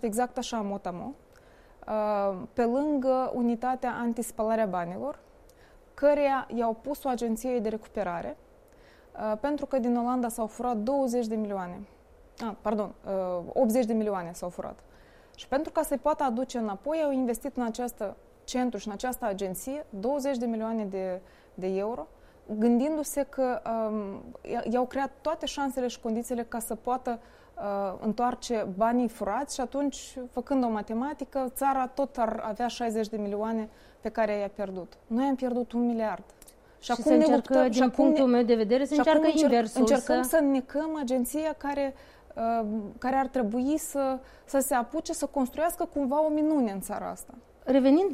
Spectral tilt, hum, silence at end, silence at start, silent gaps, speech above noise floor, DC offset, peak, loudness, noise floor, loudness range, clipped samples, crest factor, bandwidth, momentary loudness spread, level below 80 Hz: -5 dB/octave; none; 0 s; 0.05 s; none; 28 dB; under 0.1%; -10 dBFS; -29 LUFS; -56 dBFS; 7 LU; under 0.1%; 18 dB; 15.5 kHz; 13 LU; -56 dBFS